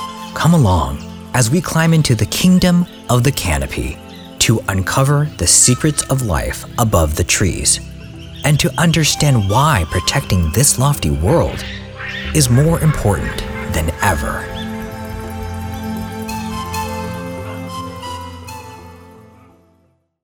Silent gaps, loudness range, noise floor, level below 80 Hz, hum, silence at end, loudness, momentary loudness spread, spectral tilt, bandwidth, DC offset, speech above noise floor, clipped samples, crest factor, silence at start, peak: none; 11 LU; -58 dBFS; -30 dBFS; none; 1 s; -15 LUFS; 15 LU; -4.5 dB/octave; over 20 kHz; under 0.1%; 44 dB; under 0.1%; 16 dB; 0 s; 0 dBFS